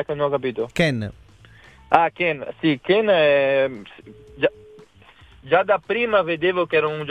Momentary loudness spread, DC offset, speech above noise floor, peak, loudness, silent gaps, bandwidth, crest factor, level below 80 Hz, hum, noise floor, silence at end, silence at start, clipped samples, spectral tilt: 8 LU; under 0.1%; 30 dB; 0 dBFS; -20 LUFS; none; 10.5 kHz; 22 dB; -54 dBFS; none; -50 dBFS; 0 s; 0 s; under 0.1%; -6.5 dB/octave